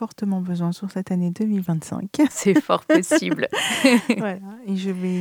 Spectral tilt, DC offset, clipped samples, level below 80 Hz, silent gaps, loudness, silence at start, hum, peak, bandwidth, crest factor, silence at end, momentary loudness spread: -5 dB/octave; under 0.1%; under 0.1%; -66 dBFS; none; -21 LUFS; 0 s; none; 0 dBFS; 19.5 kHz; 20 dB; 0 s; 10 LU